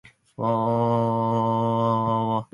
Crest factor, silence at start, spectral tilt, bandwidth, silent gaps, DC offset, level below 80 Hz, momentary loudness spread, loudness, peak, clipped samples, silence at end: 14 dB; 0.4 s; -9.5 dB/octave; 10.5 kHz; none; under 0.1%; -60 dBFS; 3 LU; -23 LUFS; -10 dBFS; under 0.1%; 0.1 s